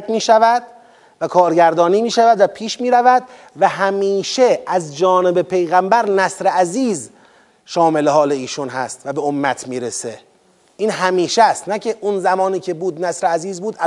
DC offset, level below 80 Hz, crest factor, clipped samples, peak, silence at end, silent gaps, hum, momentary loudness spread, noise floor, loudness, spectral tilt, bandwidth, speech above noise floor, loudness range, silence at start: under 0.1%; -72 dBFS; 16 dB; under 0.1%; 0 dBFS; 0 s; none; none; 11 LU; -54 dBFS; -16 LUFS; -4 dB/octave; 11.5 kHz; 39 dB; 5 LU; 0 s